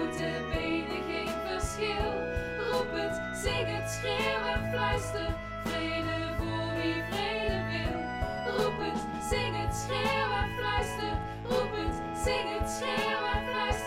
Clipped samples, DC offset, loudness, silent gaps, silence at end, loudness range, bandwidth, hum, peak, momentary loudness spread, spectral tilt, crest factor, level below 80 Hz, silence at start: under 0.1%; under 0.1%; -32 LUFS; none; 0 s; 1 LU; 16 kHz; none; -16 dBFS; 4 LU; -4.5 dB/octave; 16 dB; -42 dBFS; 0 s